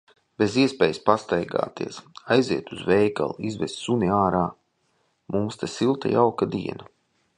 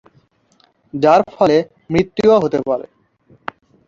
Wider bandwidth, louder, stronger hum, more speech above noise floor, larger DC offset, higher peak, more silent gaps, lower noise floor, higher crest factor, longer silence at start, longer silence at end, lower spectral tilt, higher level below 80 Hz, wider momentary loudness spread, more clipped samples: first, 10.5 kHz vs 7.6 kHz; second, -24 LUFS vs -15 LUFS; neither; about the same, 46 dB vs 43 dB; neither; about the same, -2 dBFS vs 0 dBFS; neither; first, -69 dBFS vs -57 dBFS; first, 22 dB vs 16 dB; second, 0.4 s vs 0.95 s; second, 0.55 s vs 1.05 s; about the same, -6 dB/octave vs -7 dB/octave; about the same, -54 dBFS vs -50 dBFS; second, 10 LU vs 19 LU; neither